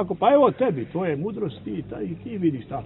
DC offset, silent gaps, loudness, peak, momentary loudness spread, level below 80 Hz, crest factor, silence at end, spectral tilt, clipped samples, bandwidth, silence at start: under 0.1%; none; -24 LUFS; -4 dBFS; 15 LU; -56 dBFS; 18 dB; 0 s; -11.5 dB/octave; under 0.1%; 4.1 kHz; 0 s